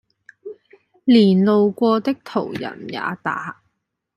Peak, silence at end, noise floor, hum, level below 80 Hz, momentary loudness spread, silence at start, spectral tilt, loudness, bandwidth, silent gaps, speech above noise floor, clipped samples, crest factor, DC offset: -2 dBFS; 0.65 s; -72 dBFS; none; -66 dBFS; 24 LU; 0.45 s; -8 dB/octave; -19 LUFS; 11 kHz; none; 55 dB; under 0.1%; 18 dB; under 0.1%